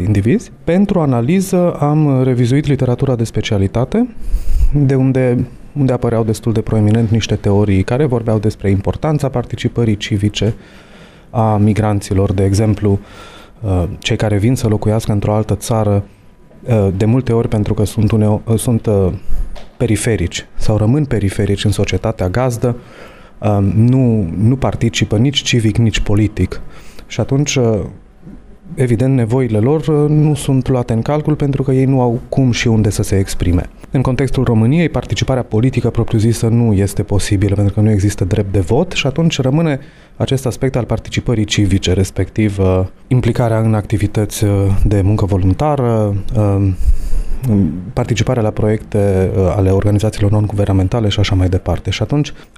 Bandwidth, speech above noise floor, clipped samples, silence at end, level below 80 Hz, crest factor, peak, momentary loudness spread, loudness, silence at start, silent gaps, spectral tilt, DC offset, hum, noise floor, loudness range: 13.5 kHz; 22 dB; under 0.1%; 0.15 s; -26 dBFS; 10 dB; -2 dBFS; 6 LU; -15 LUFS; 0 s; none; -6.5 dB/octave; under 0.1%; none; -36 dBFS; 2 LU